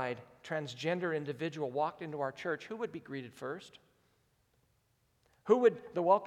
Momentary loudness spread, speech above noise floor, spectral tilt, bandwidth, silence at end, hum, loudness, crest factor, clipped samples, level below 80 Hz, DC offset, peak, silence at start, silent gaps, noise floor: 16 LU; 41 dB; -6 dB/octave; 11 kHz; 0 s; none; -35 LUFS; 22 dB; under 0.1%; -80 dBFS; under 0.1%; -14 dBFS; 0 s; none; -75 dBFS